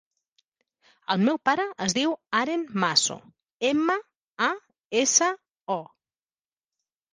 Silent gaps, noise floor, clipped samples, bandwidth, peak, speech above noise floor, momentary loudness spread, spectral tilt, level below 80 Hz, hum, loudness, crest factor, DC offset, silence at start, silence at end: 3.52-3.60 s, 4.16-4.35 s, 4.85-4.90 s, 5.51-5.55 s, 5.61-5.66 s; under -90 dBFS; under 0.1%; 10.5 kHz; -6 dBFS; over 65 dB; 11 LU; -2.5 dB/octave; -70 dBFS; none; -25 LUFS; 22 dB; under 0.1%; 1.1 s; 1.3 s